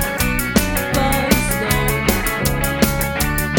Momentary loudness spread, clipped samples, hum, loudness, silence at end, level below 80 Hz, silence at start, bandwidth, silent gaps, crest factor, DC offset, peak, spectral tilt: 2 LU; under 0.1%; none; -17 LUFS; 0 s; -26 dBFS; 0 s; 17.5 kHz; none; 18 dB; under 0.1%; 0 dBFS; -4 dB/octave